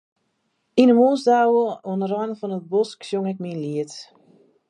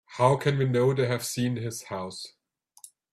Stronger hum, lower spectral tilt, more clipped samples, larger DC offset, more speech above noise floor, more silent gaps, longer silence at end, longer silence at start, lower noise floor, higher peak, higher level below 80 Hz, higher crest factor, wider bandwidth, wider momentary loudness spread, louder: neither; about the same, -6.5 dB/octave vs -5.5 dB/octave; neither; neither; first, 51 dB vs 28 dB; neither; second, 0.65 s vs 0.85 s; first, 0.75 s vs 0.1 s; first, -71 dBFS vs -54 dBFS; first, -2 dBFS vs -8 dBFS; second, -76 dBFS vs -64 dBFS; about the same, 20 dB vs 20 dB; second, 9.8 kHz vs 15 kHz; about the same, 13 LU vs 14 LU; first, -21 LUFS vs -27 LUFS